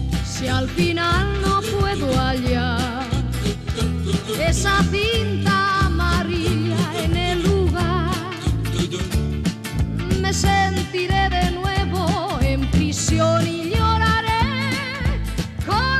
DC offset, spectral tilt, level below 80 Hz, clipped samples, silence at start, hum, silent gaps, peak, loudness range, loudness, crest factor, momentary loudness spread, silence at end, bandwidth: under 0.1%; -5 dB/octave; -28 dBFS; under 0.1%; 0 s; none; none; -8 dBFS; 2 LU; -20 LUFS; 12 dB; 6 LU; 0 s; 14 kHz